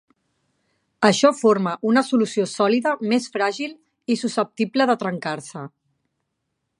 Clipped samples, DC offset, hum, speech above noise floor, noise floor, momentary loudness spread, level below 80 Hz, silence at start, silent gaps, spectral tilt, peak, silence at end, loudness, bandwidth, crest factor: under 0.1%; under 0.1%; none; 56 dB; -77 dBFS; 15 LU; -74 dBFS; 1 s; none; -4.5 dB/octave; -2 dBFS; 1.1 s; -21 LUFS; 11 kHz; 20 dB